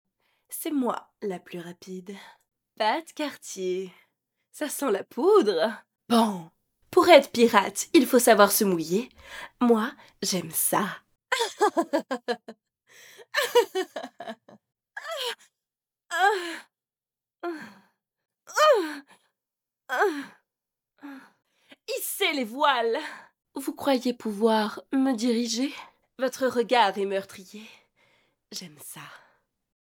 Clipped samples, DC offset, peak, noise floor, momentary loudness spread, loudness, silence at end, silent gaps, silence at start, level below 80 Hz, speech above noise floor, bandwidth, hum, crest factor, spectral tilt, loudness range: under 0.1%; under 0.1%; -2 dBFS; under -90 dBFS; 21 LU; -25 LUFS; 0.7 s; none; 0.5 s; -74 dBFS; over 65 dB; over 20 kHz; none; 24 dB; -3 dB/octave; 11 LU